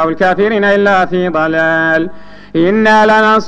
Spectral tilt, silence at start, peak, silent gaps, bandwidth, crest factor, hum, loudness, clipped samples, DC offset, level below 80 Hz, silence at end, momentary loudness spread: -6 dB/octave; 0 s; 0 dBFS; none; 9.2 kHz; 10 dB; 50 Hz at -35 dBFS; -11 LUFS; under 0.1%; under 0.1%; -44 dBFS; 0 s; 7 LU